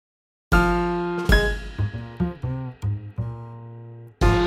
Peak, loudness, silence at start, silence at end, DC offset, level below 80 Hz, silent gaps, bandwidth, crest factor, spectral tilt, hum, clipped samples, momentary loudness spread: -4 dBFS; -24 LUFS; 0.5 s; 0 s; under 0.1%; -28 dBFS; none; 15.5 kHz; 20 dB; -6.5 dB/octave; none; under 0.1%; 19 LU